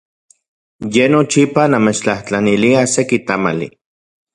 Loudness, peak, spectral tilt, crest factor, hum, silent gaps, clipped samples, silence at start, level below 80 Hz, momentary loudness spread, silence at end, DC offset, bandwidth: -14 LUFS; 0 dBFS; -5 dB/octave; 16 dB; none; none; under 0.1%; 0.8 s; -52 dBFS; 7 LU; 0.65 s; under 0.1%; 11.5 kHz